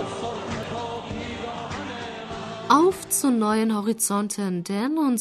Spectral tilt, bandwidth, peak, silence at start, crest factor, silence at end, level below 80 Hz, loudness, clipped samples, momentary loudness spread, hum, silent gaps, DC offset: -4 dB/octave; 13.5 kHz; -4 dBFS; 0 s; 20 dB; 0 s; -54 dBFS; -25 LUFS; under 0.1%; 14 LU; none; none; under 0.1%